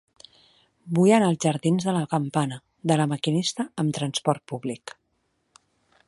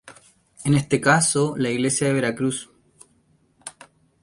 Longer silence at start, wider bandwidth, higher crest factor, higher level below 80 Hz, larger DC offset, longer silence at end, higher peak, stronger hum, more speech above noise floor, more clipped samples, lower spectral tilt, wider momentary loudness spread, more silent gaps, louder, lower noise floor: first, 0.85 s vs 0.05 s; about the same, 11.5 kHz vs 11.5 kHz; about the same, 20 dB vs 20 dB; second, -68 dBFS vs -58 dBFS; neither; first, 1.15 s vs 0.5 s; about the same, -6 dBFS vs -4 dBFS; neither; first, 49 dB vs 41 dB; neither; about the same, -5.5 dB/octave vs -4.5 dB/octave; second, 13 LU vs 22 LU; neither; second, -24 LUFS vs -21 LUFS; first, -72 dBFS vs -62 dBFS